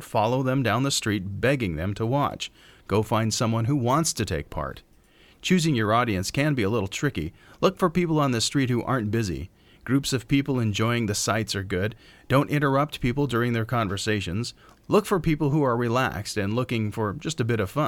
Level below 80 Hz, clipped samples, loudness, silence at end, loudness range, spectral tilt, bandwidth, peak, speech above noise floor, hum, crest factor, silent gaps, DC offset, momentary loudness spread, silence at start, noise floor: -48 dBFS; under 0.1%; -25 LUFS; 0 s; 1 LU; -5 dB/octave; 17.5 kHz; -6 dBFS; 31 dB; none; 18 dB; none; under 0.1%; 7 LU; 0 s; -56 dBFS